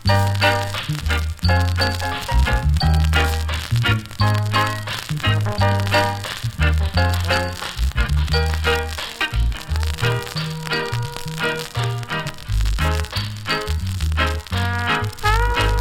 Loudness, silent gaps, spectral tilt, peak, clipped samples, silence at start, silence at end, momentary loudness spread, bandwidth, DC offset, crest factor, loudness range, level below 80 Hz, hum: -21 LUFS; none; -5 dB/octave; -4 dBFS; under 0.1%; 0 s; 0 s; 7 LU; 17 kHz; under 0.1%; 16 dB; 4 LU; -24 dBFS; none